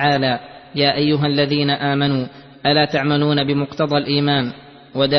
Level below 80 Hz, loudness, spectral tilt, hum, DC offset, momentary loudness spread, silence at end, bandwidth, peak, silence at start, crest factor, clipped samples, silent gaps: -52 dBFS; -18 LUFS; -7.5 dB/octave; none; under 0.1%; 8 LU; 0 s; 6.2 kHz; -2 dBFS; 0 s; 16 dB; under 0.1%; none